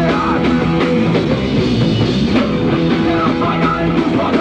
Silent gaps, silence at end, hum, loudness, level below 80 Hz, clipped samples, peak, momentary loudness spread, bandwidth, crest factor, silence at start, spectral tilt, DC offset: none; 0 s; none; -14 LUFS; -32 dBFS; under 0.1%; -2 dBFS; 1 LU; 9 kHz; 12 dB; 0 s; -7.5 dB/octave; under 0.1%